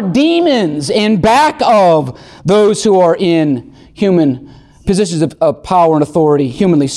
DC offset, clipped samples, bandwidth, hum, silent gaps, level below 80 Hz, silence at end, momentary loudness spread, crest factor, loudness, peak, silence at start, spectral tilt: under 0.1%; under 0.1%; 12.5 kHz; none; none; -40 dBFS; 0 s; 7 LU; 10 dB; -11 LUFS; -2 dBFS; 0 s; -6 dB/octave